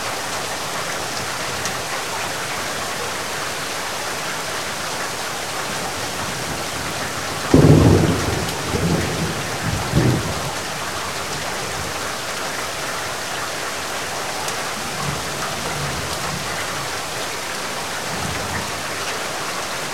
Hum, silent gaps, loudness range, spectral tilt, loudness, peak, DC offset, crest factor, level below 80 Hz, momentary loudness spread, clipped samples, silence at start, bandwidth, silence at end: none; none; 6 LU; -4 dB/octave; -22 LUFS; 0 dBFS; 1%; 22 dB; -40 dBFS; 6 LU; under 0.1%; 0 s; 16.5 kHz; 0 s